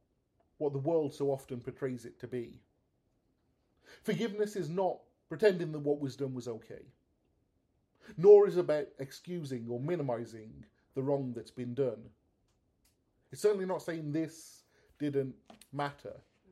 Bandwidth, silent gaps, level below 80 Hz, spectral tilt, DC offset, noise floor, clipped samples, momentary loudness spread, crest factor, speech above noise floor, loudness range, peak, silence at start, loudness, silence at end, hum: 13 kHz; none; -74 dBFS; -7 dB/octave; under 0.1%; -76 dBFS; under 0.1%; 17 LU; 24 dB; 44 dB; 9 LU; -10 dBFS; 0.6 s; -33 LUFS; 0.35 s; none